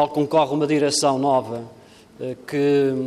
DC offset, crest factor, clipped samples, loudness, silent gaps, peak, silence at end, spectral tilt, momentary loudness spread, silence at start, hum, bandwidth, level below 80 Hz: under 0.1%; 16 dB; under 0.1%; -20 LUFS; none; -6 dBFS; 0 s; -4.5 dB/octave; 14 LU; 0 s; none; 13.5 kHz; -66 dBFS